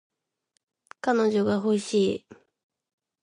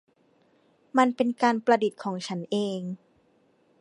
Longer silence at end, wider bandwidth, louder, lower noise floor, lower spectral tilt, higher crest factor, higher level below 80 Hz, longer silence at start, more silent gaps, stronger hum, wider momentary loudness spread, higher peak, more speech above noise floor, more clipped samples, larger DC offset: about the same, 0.9 s vs 0.85 s; about the same, 11 kHz vs 11 kHz; about the same, -25 LUFS vs -26 LUFS; first, -76 dBFS vs -65 dBFS; about the same, -5.5 dB/octave vs -5.5 dB/octave; about the same, 18 dB vs 22 dB; first, -68 dBFS vs -78 dBFS; about the same, 1.05 s vs 0.95 s; neither; neither; second, 7 LU vs 12 LU; second, -10 dBFS vs -6 dBFS; first, 52 dB vs 40 dB; neither; neither